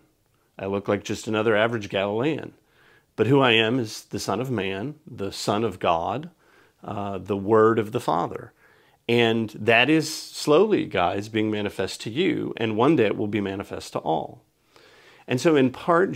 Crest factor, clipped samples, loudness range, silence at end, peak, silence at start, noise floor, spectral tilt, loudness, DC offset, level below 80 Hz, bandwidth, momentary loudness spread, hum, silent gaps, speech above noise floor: 20 dB; under 0.1%; 4 LU; 0 s; -4 dBFS; 0.6 s; -66 dBFS; -5.5 dB/octave; -23 LUFS; under 0.1%; -62 dBFS; 16 kHz; 14 LU; none; none; 43 dB